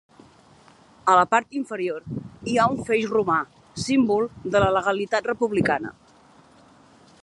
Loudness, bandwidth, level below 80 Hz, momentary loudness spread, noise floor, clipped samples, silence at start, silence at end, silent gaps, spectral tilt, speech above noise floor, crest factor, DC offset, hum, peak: -23 LUFS; 11.5 kHz; -52 dBFS; 13 LU; -53 dBFS; under 0.1%; 1.05 s; 1.3 s; none; -5.5 dB/octave; 31 dB; 20 dB; under 0.1%; none; -4 dBFS